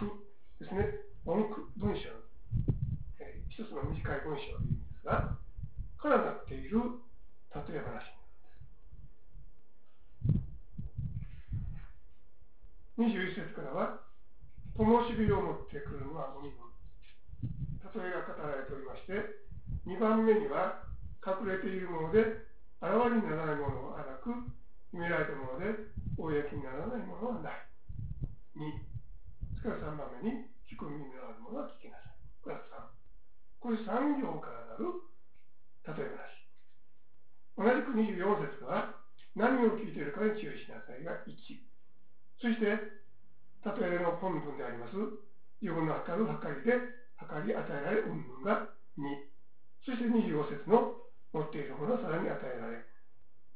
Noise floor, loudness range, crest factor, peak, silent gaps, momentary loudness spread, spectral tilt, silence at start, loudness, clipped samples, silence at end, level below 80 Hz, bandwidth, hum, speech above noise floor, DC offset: -72 dBFS; 9 LU; 24 dB; -12 dBFS; none; 18 LU; -6.5 dB/octave; 0 s; -36 LUFS; under 0.1%; 0.7 s; -50 dBFS; 4 kHz; none; 40 dB; 0.8%